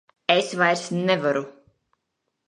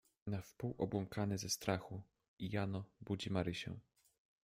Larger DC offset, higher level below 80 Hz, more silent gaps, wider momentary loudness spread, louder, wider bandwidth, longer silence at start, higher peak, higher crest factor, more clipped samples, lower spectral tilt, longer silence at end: neither; second, -74 dBFS vs -68 dBFS; second, none vs 2.28-2.37 s; second, 7 LU vs 10 LU; first, -22 LUFS vs -42 LUFS; second, 11.5 kHz vs 16 kHz; about the same, 0.3 s vs 0.25 s; first, -2 dBFS vs -22 dBFS; about the same, 22 dB vs 20 dB; neither; about the same, -4.5 dB/octave vs -5 dB/octave; first, 0.95 s vs 0.65 s